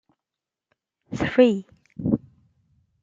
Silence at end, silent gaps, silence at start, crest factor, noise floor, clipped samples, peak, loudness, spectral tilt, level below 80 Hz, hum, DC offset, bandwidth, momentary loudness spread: 0.85 s; none; 1.1 s; 22 dB; -88 dBFS; under 0.1%; -4 dBFS; -23 LUFS; -7.5 dB/octave; -54 dBFS; none; under 0.1%; 7.6 kHz; 17 LU